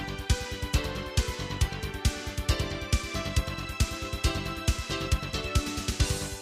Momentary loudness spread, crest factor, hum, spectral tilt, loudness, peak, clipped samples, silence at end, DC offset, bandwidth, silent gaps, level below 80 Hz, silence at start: 2 LU; 18 dB; none; -4 dB/octave; -30 LUFS; -12 dBFS; under 0.1%; 0 s; under 0.1%; 15.5 kHz; none; -32 dBFS; 0 s